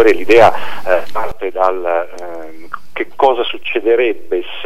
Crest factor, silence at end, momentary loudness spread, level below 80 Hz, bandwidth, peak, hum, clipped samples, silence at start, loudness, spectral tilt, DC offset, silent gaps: 14 dB; 0 s; 20 LU; -48 dBFS; 15.5 kHz; 0 dBFS; none; 0.4%; 0 s; -14 LUFS; -5 dB/octave; 8%; none